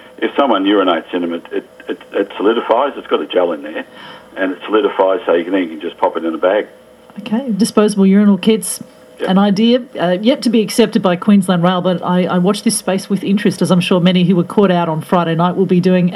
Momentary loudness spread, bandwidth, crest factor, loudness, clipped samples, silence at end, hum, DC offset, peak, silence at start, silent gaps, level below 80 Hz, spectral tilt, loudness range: 11 LU; 14.5 kHz; 14 dB; -14 LUFS; under 0.1%; 0 s; none; under 0.1%; 0 dBFS; 0.2 s; none; -60 dBFS; -6 dB/octave; 4 LU